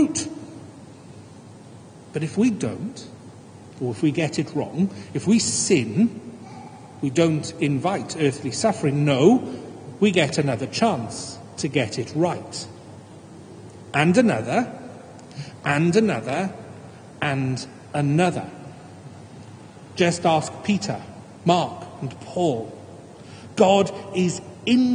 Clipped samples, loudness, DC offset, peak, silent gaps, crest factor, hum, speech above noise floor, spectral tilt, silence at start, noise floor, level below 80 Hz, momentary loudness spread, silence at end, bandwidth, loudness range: under 0.1%; -23 LUFS; under 0.1%; -2 dBFS; none; 20 dB; none; 22 dB; -5.5 dB/octave; 0 s; -44 dBFS; -64 dBFS; 23 LU; 0 s; 10 kHz; 6 LU